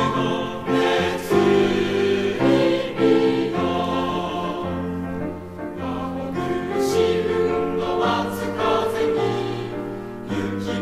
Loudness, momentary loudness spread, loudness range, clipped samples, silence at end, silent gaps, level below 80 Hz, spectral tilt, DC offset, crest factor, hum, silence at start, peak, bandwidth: -22 LUFS; 11 LU; 6 LU; under 0.1%; 0 s; none; -48 dBFS; -6 dB/octave; under 0.1%; 16 dB; none; 0 s; -6 dBFS; 15.5 kHz